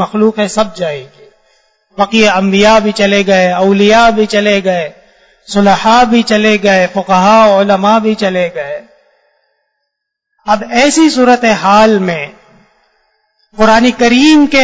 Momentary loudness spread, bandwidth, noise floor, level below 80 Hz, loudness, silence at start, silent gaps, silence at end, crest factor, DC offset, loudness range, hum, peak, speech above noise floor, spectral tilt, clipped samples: 11 LU; 8 kHz; -72 dBFS; -42 dBFS; -9 LUFS; 0 s; none; 0 s; 10 dB; under 0.1%; 4 LU; none; 0 dBFS; 64 dB; -4.5 dB/octave; 0.4%